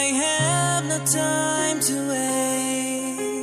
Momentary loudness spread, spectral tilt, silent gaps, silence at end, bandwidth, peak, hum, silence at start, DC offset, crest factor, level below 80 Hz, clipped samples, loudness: 5 LU; -3 dB/octave; none; 0 s; 15 kHz; -8 dBFS; none; 0 s; under 0.1%; 16 dB; -66 dBFS; under 0.1%; -22 LUFS